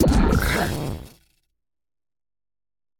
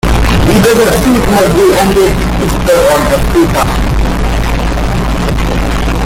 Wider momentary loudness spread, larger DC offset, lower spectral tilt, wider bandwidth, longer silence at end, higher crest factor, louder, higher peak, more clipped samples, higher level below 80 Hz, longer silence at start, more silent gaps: first, 14 LU vs 6 LU; neither; about the same, -6 dB/octave vs -5.5 dB/octave; about the same, 17.5 kHz vs 17 kHz; first, 1.9 s vs 0 s; first, 20 dB vs 8 dB; second, -22 LUFS vs -10 LUFS; second, -4 dBFS vs 0 dBFS; neither; second, -30 dBFS vs -14 dBFS; about the same, 0 s vs 0.05 s; neither